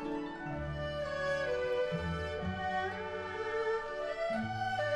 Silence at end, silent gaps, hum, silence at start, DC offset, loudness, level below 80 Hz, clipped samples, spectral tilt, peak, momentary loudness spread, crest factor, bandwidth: 0 s; none; none; 0 s; under 0.1%; -36 LUFS; -52 dBFS; under 0.1%; -6 dB/octave; -24 dBFS; 6 LU; 12 dB; 12 kHz